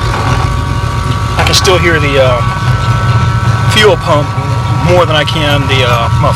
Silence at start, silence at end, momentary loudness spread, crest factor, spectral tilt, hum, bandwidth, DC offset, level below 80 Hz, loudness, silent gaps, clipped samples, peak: 0 s; 0 s; 7 LU; 10 dB; -5 dB/octave; none; 15.5 kHz; under 0.1%; -22 dBFS; -9 LUFS; none; 0.4%; 0 dBFS